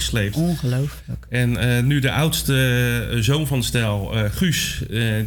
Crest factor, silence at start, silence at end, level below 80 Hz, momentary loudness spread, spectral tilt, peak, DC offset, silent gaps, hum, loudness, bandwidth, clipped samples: 10 dB; 0 s; 0 s; -36 dBFS; 5 LU; -5 dB/octave; -10 dBFS; under 0.1%; none; none; -20 LUFS; 19.5 kHz; under 0.1%